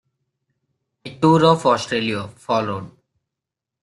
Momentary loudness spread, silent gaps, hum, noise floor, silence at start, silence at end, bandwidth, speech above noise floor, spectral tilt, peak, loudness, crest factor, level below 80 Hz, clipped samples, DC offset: 17 LU; none; none; -85 dBFS; 1.05 s; 0.95 s; 11.5 kHz; 67 dB; -6 dB/octave; -2 dBFS; -18 LUFS; 20 dB; -58 dBFS; under 0.1%; under 0.1%